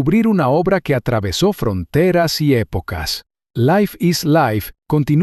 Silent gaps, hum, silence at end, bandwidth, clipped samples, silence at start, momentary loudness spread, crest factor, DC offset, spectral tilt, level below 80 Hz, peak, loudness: none; none; 0 s; 14 kHz; under 0.1%; 0 s; 8 LU; 12 dB; under 0.1%; -6 dB/octave; -38 dBFS; -4 dBFS; -17 LUFS